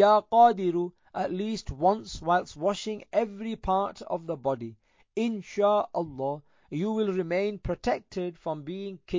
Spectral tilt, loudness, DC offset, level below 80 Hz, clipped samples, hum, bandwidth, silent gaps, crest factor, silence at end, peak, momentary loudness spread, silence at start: -6 dB/octave; -28 LUFS; under 0.1%; -52 dBFS; under 0.1%; none; 7.6 kHz; none; 18 dB; 0 s; -8 dBFS; 13 LU; 0 s